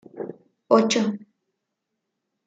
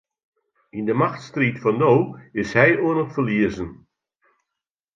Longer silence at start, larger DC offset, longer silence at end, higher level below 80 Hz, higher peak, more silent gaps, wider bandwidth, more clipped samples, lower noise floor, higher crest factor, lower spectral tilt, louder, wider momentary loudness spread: second, 0.15 s vs 0.75 s; neither; about the same, 1.3 s vs 1.2 s; second, -76 dBFS vs -54 dBFS; about the same, -4 dBFS vs -2 dBFS; neither; first, 9.2 kHz vs 7.6 kHz; neither; second, -80 dBFS vs -85 dBFS; about the same, 22 dB vs 20 dB; second, -4.5 dB/octave vs -7.5 dB/octave; about the same, -21 LUFS vs -20 LUFS; first, 18 LU vs 12 LU